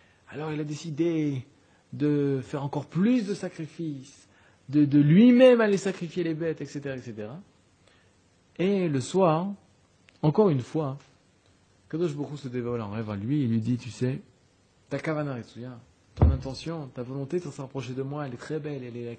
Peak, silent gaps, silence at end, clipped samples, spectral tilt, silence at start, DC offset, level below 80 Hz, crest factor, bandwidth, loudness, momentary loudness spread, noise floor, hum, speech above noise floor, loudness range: -6 dBFS; none; 0 s; under 0.1%; -7.5 dB/octave; 0.3 s; under 0.1%; -44 dBFS; 22 dB; 9.4 kHz; -27 LUFS; 15 LU; -63 dBFS; none; 37 dB; 9 LU